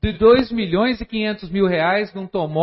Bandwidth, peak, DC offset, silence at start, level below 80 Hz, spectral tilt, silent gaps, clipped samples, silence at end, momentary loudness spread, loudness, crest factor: 5.8 kHz; -2 dBFS; under 0.1%; 0 s; -38 dBFS; -11 dB/octave; none; under 0.1%; 0 s; 9 LU; -19 LUFS; 16 dB